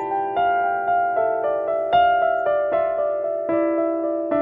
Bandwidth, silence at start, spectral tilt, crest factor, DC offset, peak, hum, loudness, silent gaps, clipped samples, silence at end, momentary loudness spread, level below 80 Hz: 3.8 kHz; 0 s; -7.5 dB/octave; 14 dB; under 0.1%; -8 dBFS; none; -21 LUFS; none; under 0.1%; 0 s; 5 LU; -58 dBFS